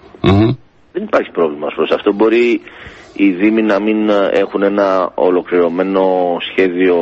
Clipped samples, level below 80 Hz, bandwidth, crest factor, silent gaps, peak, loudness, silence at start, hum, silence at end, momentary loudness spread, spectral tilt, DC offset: under 0.1%; -40 dBFS; 7.6 kHz; 14 dB; none; 0 dBFS; -14 LUFS; 0.25 s; none; 0 s; 7 LU; -8 dB/octave; under 0.1%